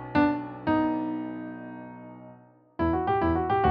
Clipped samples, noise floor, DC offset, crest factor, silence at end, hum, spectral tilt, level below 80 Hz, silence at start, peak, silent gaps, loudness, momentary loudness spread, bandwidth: under 0.1%; -53 dBFS; under 0.1%; 16 dB; 0 s; none; -6 dB/octave; -46 dBFS; 0 s; -12 dBFS; none; -27 LUFS; 20 LU; 5.2 kHz